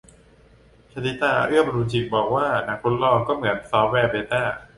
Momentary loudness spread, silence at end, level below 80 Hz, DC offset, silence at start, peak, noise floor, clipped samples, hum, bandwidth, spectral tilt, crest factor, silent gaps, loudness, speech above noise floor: 5 LU; 0.15 s; -50 dBFS; under 0.1%; 0.95 s; -4 dBFS; -53 dBFS; under 0.1%; none; 11.5 kHz; -6.5 dB/octave; 18 dB; none; -22 LUFS; 31 dB